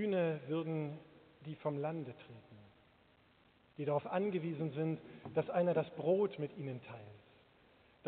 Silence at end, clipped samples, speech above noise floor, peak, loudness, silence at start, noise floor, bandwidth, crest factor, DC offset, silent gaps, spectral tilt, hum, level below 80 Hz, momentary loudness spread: 0 s; under 0.1%; 30 dB; -22 dBFS; -38 LUFS; 0 s; -69 dBFS; 4.4 kHz; 18 dB; under 0.1%; none; -7 dB/octave; none; -80 dBFS; 20 LU